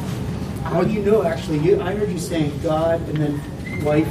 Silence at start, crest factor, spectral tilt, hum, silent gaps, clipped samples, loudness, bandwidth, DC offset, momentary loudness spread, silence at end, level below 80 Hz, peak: 0 s; 16 dB; -7 dB/octave; none; none; under 0.1%; -21 LUFS; 15 kHz; under 0.1%; 8 LU; 0 s; -38 dBFS; -4 dBFS